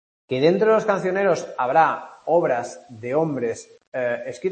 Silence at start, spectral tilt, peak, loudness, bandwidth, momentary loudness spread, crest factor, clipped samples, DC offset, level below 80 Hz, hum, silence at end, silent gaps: 0.3 s; -6 dB/octave; -4 dBFS; -21 LUFS; 8.8 kHz; 12 LU; 18 dB; under 0.1%; under 0.1%; -68 dBFS; none; 0 s; 3.87-3.92 s